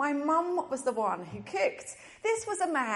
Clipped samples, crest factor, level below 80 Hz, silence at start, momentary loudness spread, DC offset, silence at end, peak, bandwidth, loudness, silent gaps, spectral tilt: under 0.1%; 14 dB; -72 dBFS; 0 s; 9 LU; under 0.1%; 0 s; -16 dBFS; 11.5 kHz; -31 LUFS; none; -4 dB/octave